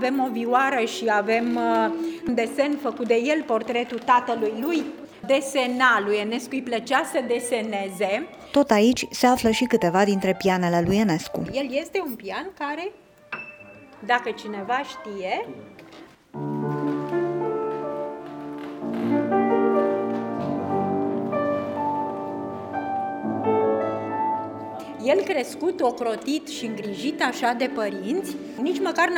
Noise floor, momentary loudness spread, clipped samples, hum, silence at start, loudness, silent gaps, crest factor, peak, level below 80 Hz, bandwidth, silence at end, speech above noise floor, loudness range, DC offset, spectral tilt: -47 dBFS; 12 LU; under 0.1%; none; 0 s; -24 LUFS; none; 18 dB; -6 dBFS; -60 dBFS; over 20 kHz; 0 s; 24 dB; 8 LU; under 0.1%; -5 dB/octave